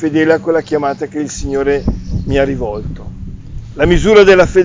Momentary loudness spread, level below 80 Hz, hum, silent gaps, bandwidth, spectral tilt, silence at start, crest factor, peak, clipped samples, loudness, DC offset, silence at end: 22 LU; -26 dBFS; none; none; 7.6 kHz; -6 dB/octave; 0 s; 12 dB; 0 dBFS; under 0.1%; -13 LUFS; under 0.1%; 0 s